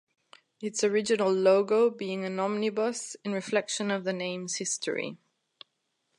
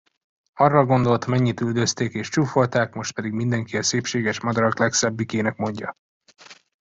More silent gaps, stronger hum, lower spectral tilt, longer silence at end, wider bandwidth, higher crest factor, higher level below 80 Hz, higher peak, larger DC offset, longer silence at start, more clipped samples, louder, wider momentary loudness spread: second, none vs 5.99-6.20 s; neither; second, -3.5 dB/octave vs -5 dB/octave; first, 1 s vs 0.3 s; first, 11.5 kHz vs 8 kHz; about the same, 18 dB vs 20 dB; second, -80 dBFS vs -58 dBFS; second, -10 dBFS vs -4 dBFS; neither; about the same, 0.6 s vs 0.55 s; neither; second, -28 LUFS vs -22 LUFS; first, 11 LU vs 8 LU